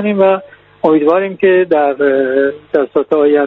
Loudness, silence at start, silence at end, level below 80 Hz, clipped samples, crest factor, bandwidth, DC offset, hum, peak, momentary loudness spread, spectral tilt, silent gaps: -13 LUFS; 0 s; 0 s; -56 dBFS; under 0.1%; 12 dB; 4.2 kHz; under 0.1%; none; 0 dBFS; 5 LU; -9 dB/octave; none